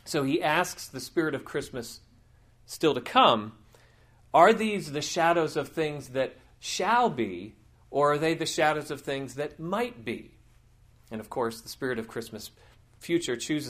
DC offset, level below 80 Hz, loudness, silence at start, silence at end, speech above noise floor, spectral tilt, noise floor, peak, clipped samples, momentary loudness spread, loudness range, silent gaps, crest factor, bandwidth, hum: under 0.1%; -62 dBFS; -27 LUFS; 0.05 s; 0 s; 31 dB; -4 dB/octave; -59 dBFS; -6 dBFS; under 0.1%; 19 LU; 10 LU; none; 24 dB; 15.5 kHz; none